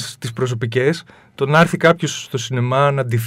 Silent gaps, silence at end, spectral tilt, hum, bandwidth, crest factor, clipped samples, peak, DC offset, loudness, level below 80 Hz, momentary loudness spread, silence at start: none; 0 s; -5.5 dB/octave; none; 16 kHz; 18 dB; under 0.1%; 0 dBFS; under 0.1%; -18 LUFS; -56 dBFS; 10 LU; 0 s